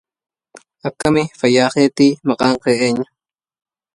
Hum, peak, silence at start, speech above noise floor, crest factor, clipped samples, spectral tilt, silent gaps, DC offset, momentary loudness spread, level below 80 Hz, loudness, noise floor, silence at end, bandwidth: none; 0 dBFS; 0.55 s; 32 dB; 16 dB; under 0.1%; -5 dB/octave; none; under 0.1%; 12 LU; -52 dBFS; -15 LUFS; -47 dBFS; 0.9 s; 11.5 kHz